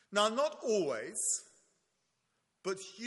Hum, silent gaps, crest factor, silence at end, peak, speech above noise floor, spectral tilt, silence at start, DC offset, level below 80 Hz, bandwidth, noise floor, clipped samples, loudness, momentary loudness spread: none; none; 22 dB; 0 s; -14 dBFS; 47 dB; -2 dB/octave; 0.1 s; under 0.1%; -86 dBFS; 11.5 kHz; -81 dBFS; under 0.1%; -34 LUFS; 9 LU